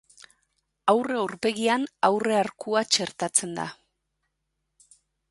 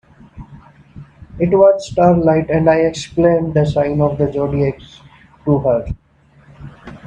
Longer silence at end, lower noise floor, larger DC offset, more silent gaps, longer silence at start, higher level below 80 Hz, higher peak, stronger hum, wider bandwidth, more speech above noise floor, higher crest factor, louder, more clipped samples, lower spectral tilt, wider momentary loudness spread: first, 1.55 s vs 0 s; first, -79 dBFS vs -50 dBFS; neither; neither; second, 0.2 s vs 0.35 s; second, -72 dBFS vs -40 dBFS; second, -6 dBFS vs 0 dBFS; neither; first, 12 kHz vs 9.6 kHz; first, 54 dB vs 36 dB; first, 22 dB vs 16 dB; second, -25 LUFS vs -15 LUFS; neither; second, -2.5 dB/octave vs -7.5 dB/octave; second, 6 LU vs 15 LU